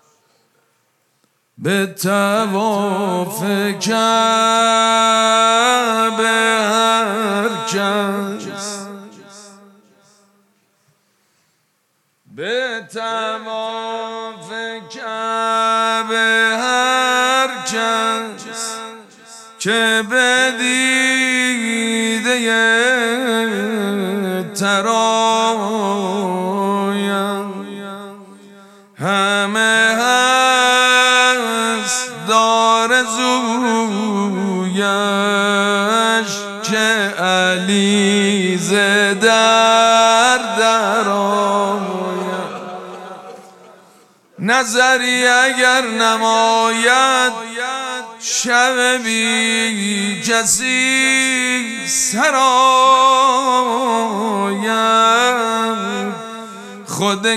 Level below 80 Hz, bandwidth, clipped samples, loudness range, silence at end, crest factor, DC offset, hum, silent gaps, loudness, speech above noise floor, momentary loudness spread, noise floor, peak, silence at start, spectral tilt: -68 dBFS; 14.5 kHz; under 0.1%; 9 LU; 0 s; 16 dB; under 0.1%; none; none; -15 LUFS; 50 dB; 13 LU; -65 dBFS; 0 dBFS; 1.6 s; -2.5 dB/octave